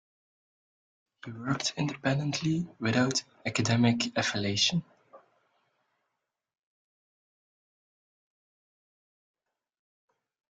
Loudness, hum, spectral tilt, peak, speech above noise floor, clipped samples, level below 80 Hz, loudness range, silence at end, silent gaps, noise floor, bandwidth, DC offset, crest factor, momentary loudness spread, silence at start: -29 LUFS; none; -4.5 dB/octave; -10 dBFS; 56 dB; under 0.1%; -68 dBFS; 6 LU; 5.35 s; none; -85 dBFS; 9.4 kHz; under 0.1%; 22 dB; 9 LU; 1.25 s